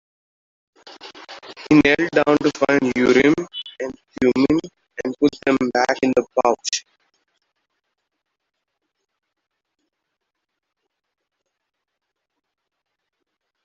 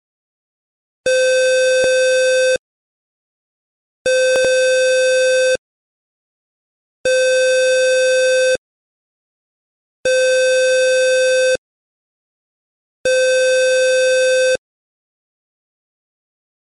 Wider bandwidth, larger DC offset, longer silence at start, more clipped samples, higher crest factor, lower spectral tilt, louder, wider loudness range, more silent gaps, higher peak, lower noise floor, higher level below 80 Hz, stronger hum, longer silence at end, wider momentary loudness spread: second, 7.8 kHz vs 12 kHz; neither; second, 0.9 s vs 1.05 s; neither; first, 20 dB vs 6 dB; first, -4.5 dB/octave vs 0.5 dB/octave; second, -18 LUFS vs -15 LUFS; first, 7 LU vs 0 LU; second, none vs 2.59-4.05 s, 5.58-7.04 s, 8.58-10.04 s, 11.58-13.04 s; first, -2 dBFS vs -10 dBFS; second, -79 dBFS vs under -90 dBFS; about the same, -56 dBFS vs -58 dBFS; neither; first, 6.85 s vs 2.2 s; first, 22 LU vs 7 LU